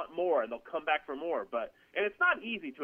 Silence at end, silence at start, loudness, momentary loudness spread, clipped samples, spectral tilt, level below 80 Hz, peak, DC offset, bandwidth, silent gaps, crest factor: 0 s; 0 s; -33 LUFS; 9 LU; under 0.1%; -5.5 dB/octave; -72 dBFS; -16 dBFS; under 0.1%; 5 kHz; none; 18 dB